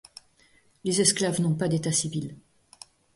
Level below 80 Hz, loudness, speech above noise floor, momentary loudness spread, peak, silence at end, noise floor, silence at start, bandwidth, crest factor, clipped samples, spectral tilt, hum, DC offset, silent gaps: -62 dBFS; -25 LUFS; 36 dB; 13 LU; -6 dBFS; 0.75 s; -62 dBFS; 0.85 s; 11.5 kHz; 22 dB; under 0.1%; -4 dB/octave; none; under 0.1%; none